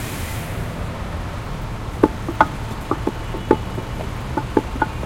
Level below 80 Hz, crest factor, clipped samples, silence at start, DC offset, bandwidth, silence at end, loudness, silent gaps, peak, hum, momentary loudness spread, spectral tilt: -32 dBFS; 22 dB; under 0.1%; 0 s; under 0.1%; 16.5 kHz; 0 s; -24 LUFS; none; 0 dBFS; none; 9 LU; -6 dB/octave